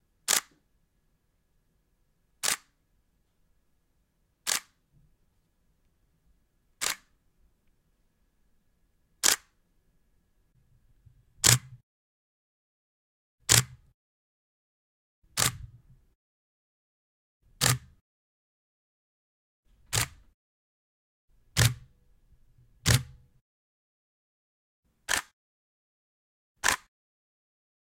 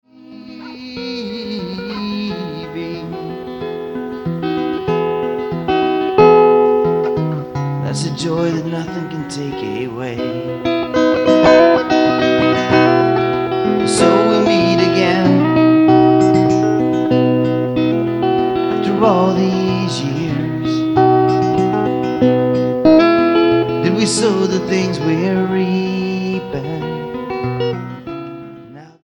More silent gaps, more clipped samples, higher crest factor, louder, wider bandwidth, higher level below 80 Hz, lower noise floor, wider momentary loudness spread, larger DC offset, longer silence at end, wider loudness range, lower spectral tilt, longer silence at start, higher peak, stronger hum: first, 11.83-13.38 s, 13.94-15.22 s, 16.15-17.40 s, 18.01-19.63 s, 20.34-21.28 s, 23.41-24.83 s, 25.33-26.55 s vs none; neither; first, 34 dB vs 14 dB; second, -27 LUFS vs -15 LUFS; about the same, 16.5 kHz vs 17.5 kHz; second, -54 dBFS vs -48 dBFS; first, -72 dBFS vs -37 dBFS; about the same, 14 LU vs 15 LU; neither; first, 1.15 s vs 0.2 s; about the same, 10 LU vs 9 LU; second, -1.5 dB/octave vs -6 dB/octave; about the same, 0.3 s vs 0.3 s; about the same, -2 dBFS vs 0 dBFS; neither